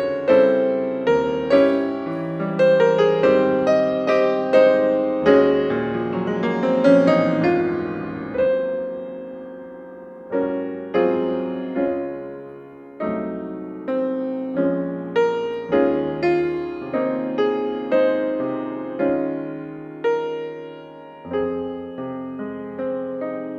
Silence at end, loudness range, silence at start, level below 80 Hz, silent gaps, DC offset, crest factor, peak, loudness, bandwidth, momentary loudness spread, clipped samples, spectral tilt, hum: 0 s; 9 LU; 0 s; -58 dBFS; none; under 0.1%; 18 dB; -4 dBFS; -21 LUFS; 7.4 kHz; 16 LU; under 0.1%; -7.5 dB/octave; none